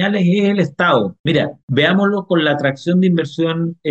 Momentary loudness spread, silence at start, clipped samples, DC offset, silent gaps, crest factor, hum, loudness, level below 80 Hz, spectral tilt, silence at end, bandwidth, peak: 4 LU; 0 s; under 0.1%; under 0.1%; 1.20-1.24 s, 1.63-1.68 s; 12 dB; none; -16 LUFS; -58 dBFS; -7.5 dB/octave; 0 s; 8 kHz; -4 dBFS